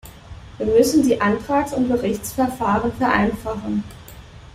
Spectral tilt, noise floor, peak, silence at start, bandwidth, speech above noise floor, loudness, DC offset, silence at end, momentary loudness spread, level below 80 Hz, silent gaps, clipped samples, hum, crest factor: -5.5 dB/octave; -40 dBFS; -4 dBFS; 0.05 s; 16 kHz; 21 dB; -20 LUFS; under 0.1%; 0.1 s; 13 LU; -42 dBFS; none; under 0.1%; none; 18 dB